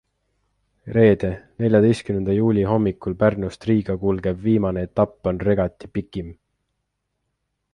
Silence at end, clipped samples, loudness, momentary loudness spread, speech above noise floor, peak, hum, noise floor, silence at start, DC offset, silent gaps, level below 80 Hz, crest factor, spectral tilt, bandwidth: 1.4 s; under 0.1%; -21 LUFS; 11 LU; 56 dB; -2 dBFS; 50 Hz at -45 dBFS; -76 dBFS; 0.85 s; under 0.1%; none; -44 dBFS; 20 dB; -8.5 dB/octave; 10.5 kHz